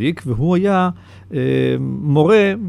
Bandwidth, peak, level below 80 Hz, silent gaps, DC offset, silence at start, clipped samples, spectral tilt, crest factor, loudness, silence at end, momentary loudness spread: 11.5 kHz; -2 dBFS; -44 dBFS; none; under 0.1%; 0 s; under 0.1%; -8 dB/octave; 14 dB; -16 LUFS; 0 s; 9 LU